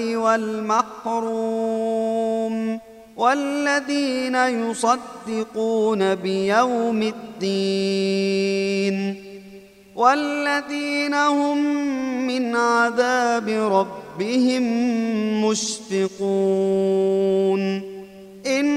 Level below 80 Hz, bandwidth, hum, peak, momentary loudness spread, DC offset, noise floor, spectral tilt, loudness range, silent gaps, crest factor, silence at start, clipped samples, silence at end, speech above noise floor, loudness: -64 dBFS; 13 kHz; none; -2 dBFS; 8 LU; under 0.1%; -44 dBFS; -4.5 dB/octave; 2 LU; none; 18 dB; 0 s; under 0.1%; 0 s; 23 dB; -21 LUFS